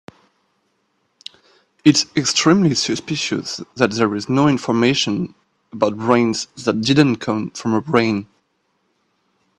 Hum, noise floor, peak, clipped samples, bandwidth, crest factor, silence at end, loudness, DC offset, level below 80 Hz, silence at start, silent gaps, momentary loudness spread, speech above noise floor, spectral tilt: none; -67 dBFS; 0 dBFS; under 0.1%; 11.5 kHz; 20 dB; 1.35 s; -18 LUFS; under 0.1%; -56 dBFS; 1.85 s; none; 11 LU; 50 dB; -4.5 dB/octave